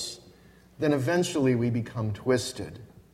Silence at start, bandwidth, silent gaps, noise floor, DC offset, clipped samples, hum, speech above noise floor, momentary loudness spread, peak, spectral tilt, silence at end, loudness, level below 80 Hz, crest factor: 0 s; 15.5 kHz; none; -55 dBFS; under 0.1%; under 0.1%; none; 28 dB; 16 LU; -12 dBFS; -5.5 dB/octave; 0.15 s; -27 LUFS; -58 dBFS; 16 dB